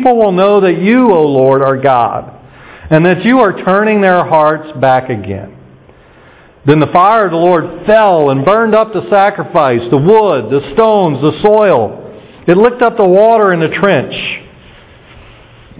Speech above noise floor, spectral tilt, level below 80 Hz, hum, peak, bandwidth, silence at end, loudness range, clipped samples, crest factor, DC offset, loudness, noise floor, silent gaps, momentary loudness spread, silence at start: 32 dB; -10.5 dB/octave; -44 dBFS; none; 0 dBFS; 4 kHz; 1.4 s; 3 LU; 2%; 10 dB; under 0.1%; -9 LUFS; -40 dBFS; none; 8 LU; 0 s